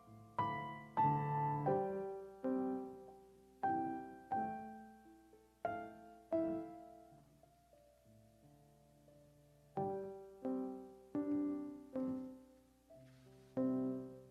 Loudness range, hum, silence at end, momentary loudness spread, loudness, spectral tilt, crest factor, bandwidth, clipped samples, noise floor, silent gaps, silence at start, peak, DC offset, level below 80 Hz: 10 LU; none; 0 s; 22 LU; -42 LUFS; -9 dB/octave; 18 dB; 13.5 kHz; under 0.1%; -69 dBFS; none; 0 s; -24 dBFS; under 0.1%; -76 dBFS